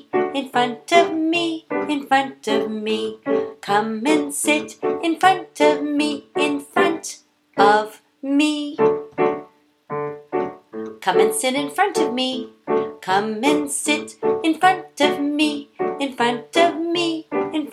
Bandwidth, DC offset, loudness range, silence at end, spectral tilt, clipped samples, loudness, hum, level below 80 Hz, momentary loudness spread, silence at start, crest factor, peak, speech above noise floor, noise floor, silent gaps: 15 kHz; under 0.1%; 3 LU; 0 s; -3 dB/octave; under 0.1%; -20 LUFS; none; -70 dBFS; 9 LU; 0.15 s; 20 dB; 0 dBFS; 27 dB; -47 dBFS; none